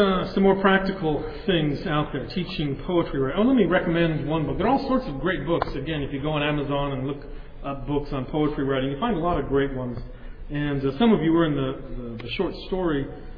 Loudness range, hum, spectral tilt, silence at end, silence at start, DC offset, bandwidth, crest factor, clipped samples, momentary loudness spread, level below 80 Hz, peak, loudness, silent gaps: 4 LU; none; -9 dB/octave; 0 s; 0 s; under 0.1%; 5.4 kHz; 18 dB; under 0.1%; 12 LU; -38 dBFS; -6 dBFS; -24 LUFS; none